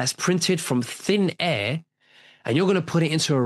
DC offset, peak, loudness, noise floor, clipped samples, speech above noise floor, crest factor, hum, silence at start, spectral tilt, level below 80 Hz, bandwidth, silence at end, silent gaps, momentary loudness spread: under 0.1%; -6 dBFS; -23 LUFS; -55 dBFS; under 0.1%; 32 dB; 16 dB; none; 0 s; -4.5 dB/octave; -64 dBFS; 12.5 kHz; 0 s; none; 5 LU